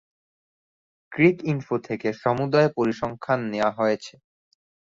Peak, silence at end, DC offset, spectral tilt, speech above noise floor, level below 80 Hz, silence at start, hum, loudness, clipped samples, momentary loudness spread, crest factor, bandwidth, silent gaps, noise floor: -4 dBFS; 0.85 s; under 0.1%; -7 dB/octave; over 67 dB; -62 dBFS; 1.1 s; none; -24 LUFS; under 0.1%; 10 LU; 20 dB; 7.6 kHz; none; under -90 dBFS